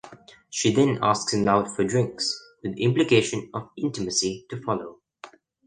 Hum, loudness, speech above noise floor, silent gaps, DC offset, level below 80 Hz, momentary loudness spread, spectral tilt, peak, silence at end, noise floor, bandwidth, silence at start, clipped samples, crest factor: none; -24 LUFS; 25 dB; none; under 0.1%; -58 dBFS; 12 LU; -4.5 dB/octave; -6 dBFS; 0.4 s; -48 dBFS; 10 kHz; 0.05 s; under 0.1%; 20 dB